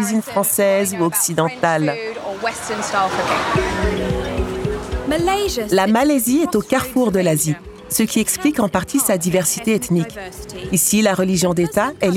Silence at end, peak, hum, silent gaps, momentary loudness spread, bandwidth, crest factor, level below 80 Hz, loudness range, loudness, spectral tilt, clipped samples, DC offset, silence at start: 0 s; -2 dBFS; none; none; 8 LU; 18 kHz; 16 dB; -36 dBFS; 3 LU; -18 LUFS; -4 dB/octave; under 0.1%; under 0.1%; 0 s